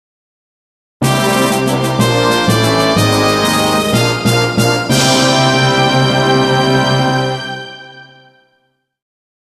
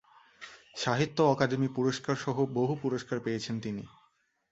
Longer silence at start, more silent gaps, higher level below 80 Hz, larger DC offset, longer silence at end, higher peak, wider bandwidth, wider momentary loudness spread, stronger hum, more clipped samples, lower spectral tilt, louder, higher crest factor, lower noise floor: first, 1 s vs 0.4 s; neither; first, -42 dBFS vs -66 dBFS; neither; first, 1.4 s vs 0.65 s; first, 0 dBFS vs -10 dBFS; first, 14 kHz vs 8.2 kHz; second, 6 LU vs 19 LU; neither; neither; second, -4.5 dB/octave vs -6 dB/octave; first, -12 LUFS vs -30 LUFS; second, 14 dB vs 22 dB; second, -62 dBFS vs -71 dBFS